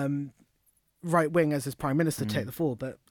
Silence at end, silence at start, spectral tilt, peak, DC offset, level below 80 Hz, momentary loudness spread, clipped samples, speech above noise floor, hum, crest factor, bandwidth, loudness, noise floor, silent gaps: 0.15 s; 0 s; -6.5 dB/octave; -12 dBFS; under 0.1%; -60 dBFS; 12 LU; under 0.1%; 42 dB; none; 18 dB; 19.5 kHz; -29 LUFS; -70 dBFS; none